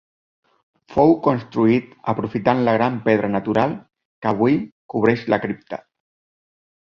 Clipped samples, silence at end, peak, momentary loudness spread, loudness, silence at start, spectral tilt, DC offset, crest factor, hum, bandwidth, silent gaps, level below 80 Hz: under 0.1%; 1.05 s; -2 dBFS; 11 LU; -20 LUFS; 0.9 s; -9 dB/octave; under 0.1%; 18 dB; none; 6.8 kHz; 4.05-4.22 s, 4.72-4.89 s; -54 dBFS